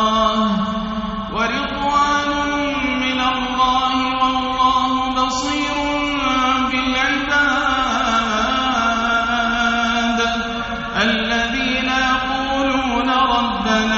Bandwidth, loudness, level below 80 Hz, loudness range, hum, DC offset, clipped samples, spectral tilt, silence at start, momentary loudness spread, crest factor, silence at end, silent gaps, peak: 8 kHz; -18 LUFS; -38 dBFS; 1 LU; none; under 0.1%; under 0.1%; -1.5 dB/octave; 0 s; 4 LU; 14 dB; 0 s; none; -4 dBFS